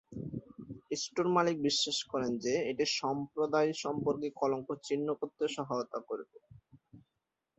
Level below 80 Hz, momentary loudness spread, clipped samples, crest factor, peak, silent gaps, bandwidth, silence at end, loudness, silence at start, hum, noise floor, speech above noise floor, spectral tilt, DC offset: -70 dBFS; 13 LU; under 0.1%; 20 dB; -14 dBFS; none; 8.2 kHz; 0.6 s; -34 LUFS; 0.1 s; none; -86 dBFS; 53 dB; -4 dB/octave; under 0.1%